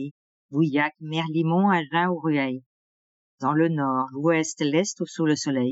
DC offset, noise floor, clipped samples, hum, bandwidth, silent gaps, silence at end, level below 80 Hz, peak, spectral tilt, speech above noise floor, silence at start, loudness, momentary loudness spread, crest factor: under 0.1%; under -90 dBFS; under 0.1%; none; 8 kHz; 0.11-0.49 s, 2.66-3.38 s; 0 s; -84 dBFS; -8 dBFS; -5.5 dB/octave; over 67 dB; 0 s; -24 LUFS; 8 LU; 16 dB